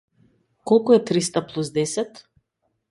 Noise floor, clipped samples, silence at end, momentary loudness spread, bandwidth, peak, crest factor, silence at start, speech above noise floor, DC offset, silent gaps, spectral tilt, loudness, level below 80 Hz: -74 dBFS; under 0.1%; 0.7 s; 13 LU; 11.5 kHz; -4 dBFS; 20 dB; 0.65 s; 53 dB; under 0.1%; none; -5 dB/octave; -21 LUFS; -64 dBFS